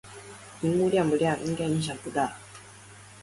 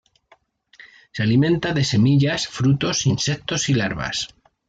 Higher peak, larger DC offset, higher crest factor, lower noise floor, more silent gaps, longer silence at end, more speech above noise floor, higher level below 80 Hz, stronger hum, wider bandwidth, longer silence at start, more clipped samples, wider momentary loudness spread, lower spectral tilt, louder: second, -14 dBFS vs -6 dBFS; neither; about the same, 16 dB vs 14 dB; second, -49 dBFS vs -58 dBFS; neither; second, 0 s vs 0.45 s; second, 23 dB vs 39 dB; second, -60 dBFS vs -50 dBFS; neither; first, 11.5 kHz vs 9 kHz; second, 0.05 s vs 0.8 s; neither; first, 23 LU vs 8 LU; about the same, -6 dB/octave vs -5 dB/octave; second, -27 LUFS vs -20 LUFS